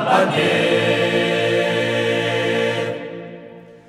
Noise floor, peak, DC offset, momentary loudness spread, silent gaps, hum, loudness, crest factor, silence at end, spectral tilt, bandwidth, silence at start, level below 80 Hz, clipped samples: -40 dBFS; -4 dBFS; under 0.1%; 15 LU; none; none; -18 LUFS; 16 dB; 0.1 s; -5 dB/octave; 15.5 kHz; 0 s; -68 dBFS; under 0.1%